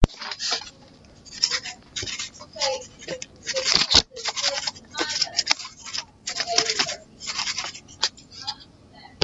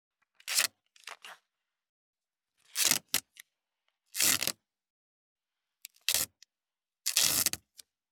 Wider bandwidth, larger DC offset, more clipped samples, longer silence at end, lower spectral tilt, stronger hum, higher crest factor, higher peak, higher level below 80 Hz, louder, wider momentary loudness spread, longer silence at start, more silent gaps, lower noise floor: second, 10.5 kHz vs over 20 kHz; neither; neither; second, 0 s vs 0.55 s; first, -1.5 dB/octave vs 1 dB/octave; neither; about the same, 26 dB vs 30 dB; first, 0 dBFS vs -4 dBFS; first, -40 dBFS vs -74 dBFS; first, -24 LUFS vs -29 LUFS; second, 14 LU vs 21 LU; second, 0 s vs 0.45 s; second, none vs 1.89-2.13 s, 4.90-5.36 s; second, -50 dBFS vs under -90 dBFS